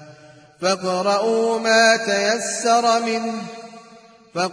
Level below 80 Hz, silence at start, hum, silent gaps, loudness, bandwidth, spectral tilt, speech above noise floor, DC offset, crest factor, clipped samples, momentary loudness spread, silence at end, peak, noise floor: -72 dBFS; 0 s; none; none; -19 LUFS; 10.5 kHz; -2.5 dB/octave; 28 dB; under 0.1%; 16 dB; under 0.1%; 15 LU; 0 s; -4 dBFS; -47 dBFS